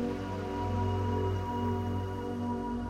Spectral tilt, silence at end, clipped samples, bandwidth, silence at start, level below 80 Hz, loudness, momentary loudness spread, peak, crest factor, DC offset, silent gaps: -8 dB/octave; 0 s; under 0.1%; 9 kHz; 0 s; -48 dBFS; -33 LUFS; 4 LU; -20 dBFS; 12 dB; under 0.1%; none